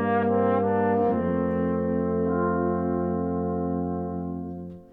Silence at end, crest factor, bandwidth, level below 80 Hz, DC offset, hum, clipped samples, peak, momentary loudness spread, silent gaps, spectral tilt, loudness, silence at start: 0.1 s; 12 dB; 3.7 kHz; -52 dBFS; under 0.1%; none; under 0.1%; -12 dBFS; 9 LU; none; -11.5 dB/octave; -25 LUFS; 0 s